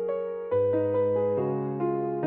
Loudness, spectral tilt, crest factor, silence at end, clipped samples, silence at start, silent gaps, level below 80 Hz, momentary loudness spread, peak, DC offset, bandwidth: -27 LUFS; -9 dB/octave; 10 dB; 0 s; under 0.1%; 0 s; none; -68 dBFS; 4 LU; -16 dBFS; under 0.1%; 3.7 kHz